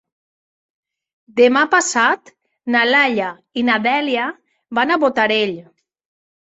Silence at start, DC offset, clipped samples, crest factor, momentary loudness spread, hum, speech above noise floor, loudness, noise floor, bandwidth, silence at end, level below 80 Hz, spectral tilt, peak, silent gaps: 1.35 s; under 0.1%; under 0.1%; 18 dB; 11 LU; none; over 74 dB; -16 LUFS; under -90 dBFS; 8.2 kHz; 0.95 s; -66 dBFS; -2.5 dB/octave; 0 dBFS; none